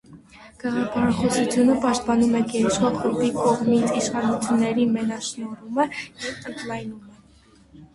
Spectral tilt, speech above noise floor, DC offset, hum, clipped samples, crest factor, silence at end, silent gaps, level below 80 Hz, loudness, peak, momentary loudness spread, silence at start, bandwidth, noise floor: -5 dB/octave; 32 dB; under 0.1%; none; under 0.1%; 16 dB; 0.1 s; none; -54 dBFS; -22 LUFS; -8 dBFS; 12 LU; 0.1 s; 11.5 kHz; -53 dBFS